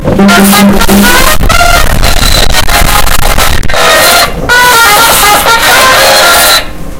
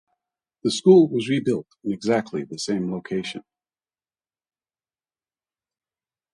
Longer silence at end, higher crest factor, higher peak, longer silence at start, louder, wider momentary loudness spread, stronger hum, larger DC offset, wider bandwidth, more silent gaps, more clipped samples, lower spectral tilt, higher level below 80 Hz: second, 0 s vs 2.95 s; second, 4 dB vs 22 dB; first, 0 dBFS vs -4 dBFS; second, 0 s vs 0.65 s; first, -3 LUFS vs -22 LUFS; second, 5 LU vs 15 LU; neither; neither; first, over 20 kHz vs 11.5 kHz; neither; first, 10% vs under 0.1%; second, -2.5 dB/octave vs -6 dB/octave; first, -12 dBFS vs -66 dBFS